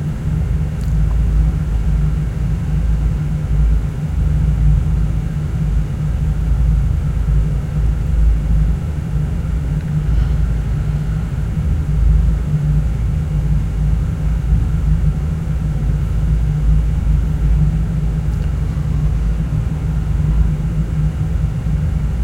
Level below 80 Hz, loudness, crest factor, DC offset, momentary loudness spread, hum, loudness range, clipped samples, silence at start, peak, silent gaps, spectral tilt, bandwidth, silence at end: -18 dBFS; -18 LUFS; 12 dB; under 0.1%; 4 LU; none; 1 LU; under 0.1%; 0 s; -4 dBFS; none; -8.5 dB/octave; 8 kHz; 0 s